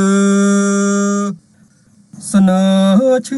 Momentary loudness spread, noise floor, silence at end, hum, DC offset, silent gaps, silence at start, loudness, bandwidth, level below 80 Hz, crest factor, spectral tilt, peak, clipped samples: 10 LU; -49 dBFS; 0 s; none; under 0.1%; none; 0 s; -13 LUFS; 12 kHz; -56 dBFS; 10 dB; -6 dB/octave; -2 dBFS; under 0.1%